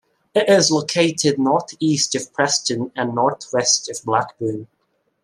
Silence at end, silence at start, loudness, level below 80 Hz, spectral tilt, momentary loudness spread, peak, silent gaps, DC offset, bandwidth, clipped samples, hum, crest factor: 0.6 s; 0.35 s; -19 LUFS; -66 dBFS; -3 dB/octave; 8 LU; -2 dBFS; none; under 0.1%; 13 kHz; under 0.1%; none; 18 dB